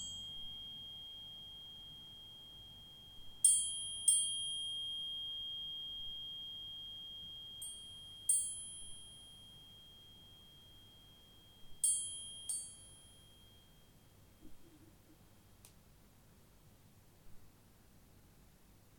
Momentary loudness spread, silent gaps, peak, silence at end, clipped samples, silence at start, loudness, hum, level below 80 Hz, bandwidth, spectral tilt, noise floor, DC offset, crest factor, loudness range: 26 LU; none; -16 dBFS; 0 s; under 0.1%; 0 s; -37 LUFS; none; -68 dBFS; 17.5 kHz; 1 dB/octave; -64 dBFS; under 0.1%; 28 dB; 14 LU